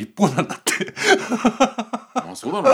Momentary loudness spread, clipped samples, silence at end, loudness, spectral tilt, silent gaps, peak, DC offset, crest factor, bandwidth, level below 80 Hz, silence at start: 10 LU; under 0.1%; 0 s; -20 LUFS; -4 dB/octave; none; -2 dBFS; under 0.1%; 18 dB; over 20 kHz; -60 dBFS; 0 s